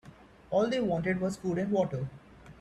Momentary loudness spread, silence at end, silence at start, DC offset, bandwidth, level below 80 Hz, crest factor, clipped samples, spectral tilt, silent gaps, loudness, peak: 6 LU; 0.1 s; 0.05 s; under 0.1%; 12 kHz; -58 dBFS; 14 dB; under 0.1%; -7 dB/octave; none; -31 LUFS; -16 dBFS